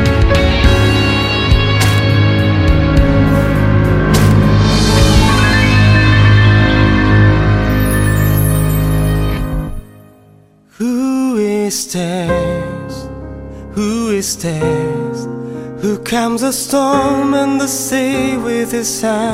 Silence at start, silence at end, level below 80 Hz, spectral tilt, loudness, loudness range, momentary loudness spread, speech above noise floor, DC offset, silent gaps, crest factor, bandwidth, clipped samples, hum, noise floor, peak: 0 s; 0 s; -20 dBFS; -5.5 dB/octave; -12 LUFS; 8 LU; 12 LU; 31 dB; under 0.1%; none; 12 dB; 16 kHz; under 0.1%; none; -45 dBFS; 0 dBFS